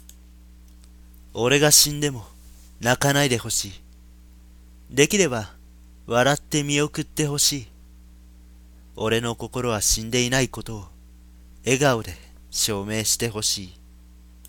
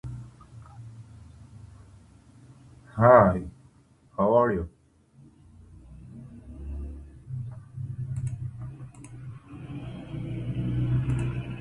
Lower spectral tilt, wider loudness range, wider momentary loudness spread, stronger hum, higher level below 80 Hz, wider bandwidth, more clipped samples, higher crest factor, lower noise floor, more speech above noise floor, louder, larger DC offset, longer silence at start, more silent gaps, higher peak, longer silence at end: second, -3 dB/octave vs -9 dB/octave; second, 5 LU vs 15 LU; second, 15 LU vs 25 LU; neither; about the same, -44 dBFS vs -46 dBFS; first, 17.5 kHz vs 11 kHz; neither; about the same, 24 dB vs 26 dB; second, -47 dBFS vs -58 dBFS; second, 25 dB vs 38 dB; first, -21 LUFS vs -26 LUFS; neither; about the same, 0.1 s vs 0.05 s; neither; about the same, -2 dBFS vs -4 dBFS; first, 0.75 s vs 0 s